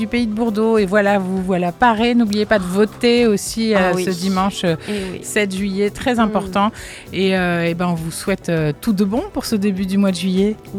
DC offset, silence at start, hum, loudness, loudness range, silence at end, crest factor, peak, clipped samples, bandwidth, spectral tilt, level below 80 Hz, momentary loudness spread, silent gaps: under 0.1%; 0 s; none; -18 LUFS; 3 LU; 0 s; 16 dB; -2 dBFS; under 0.1%; 15.5 kHz; -5.5 dB/octave; -42 dBFS; 6 LU; none